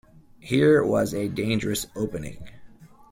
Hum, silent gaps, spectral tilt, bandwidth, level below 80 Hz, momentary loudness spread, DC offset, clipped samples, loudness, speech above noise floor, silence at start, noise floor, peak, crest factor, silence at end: none; none; -5.5 dB/octave; 16.5 kHz; -52 dBFS; 12 LU; under 0.1%; under 0.1%; -24 LUFS; 24 dB; 0.45 s; -47 dBFS; -8 dBFS; 18 dB; 0.25 s